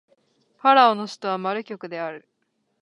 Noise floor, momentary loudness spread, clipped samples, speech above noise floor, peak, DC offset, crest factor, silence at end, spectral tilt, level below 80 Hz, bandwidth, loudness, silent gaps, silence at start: -73 dBFS; 16 LU; under 0.1%; 52 dB; -2 dBFS; under 0.1%; 22 dB; 0.65 s; -4.5 dB/octave; -82 dBFS; 11 kHz; -21 LUFS; none; 0.65 s